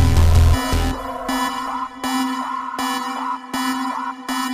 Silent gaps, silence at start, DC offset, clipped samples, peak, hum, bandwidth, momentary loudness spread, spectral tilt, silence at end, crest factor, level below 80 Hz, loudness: none; 0 s; under 0.1%; under 0.1%; -4 dBFS; none; 15.5 kHz; 10 LU; -5 dB/octave; 0 s; 16 dB; -24 dBFS; -21 LUFS